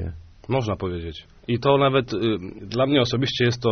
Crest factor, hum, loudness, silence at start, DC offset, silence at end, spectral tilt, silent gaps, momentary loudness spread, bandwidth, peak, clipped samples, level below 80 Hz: 18 dB; none; -23 LUFS; 0 s; under 0.1%; 0 s; -4.5 dB/octave; none; 15 LU; 6.6 kHz; -4 dBFS; under 0.1%; -46 dBFS